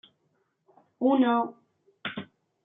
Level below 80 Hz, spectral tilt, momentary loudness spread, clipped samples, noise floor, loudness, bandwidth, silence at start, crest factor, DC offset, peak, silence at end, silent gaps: -80 dBFS; -9 dB/octave; 16 LU; under 0.1%; -73 dBFS; -27 LUFS; 3.9 kHz; 1 s; 18 dB; under 0.1%; -12 dBFS; 0.4 s; none